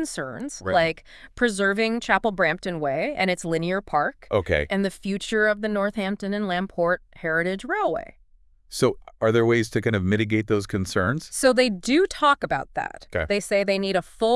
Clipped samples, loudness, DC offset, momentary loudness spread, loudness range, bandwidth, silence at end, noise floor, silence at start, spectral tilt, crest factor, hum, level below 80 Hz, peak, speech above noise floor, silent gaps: under 0.1%; -24 LUFS; under 0.1%; 7 LU; 3 LU; 12 kHz; 0 s; -56 dBFS; 0 s; -5 dB/octave; 18 dB; none; -48 dBFS; -4 dBFS; 32 dB; none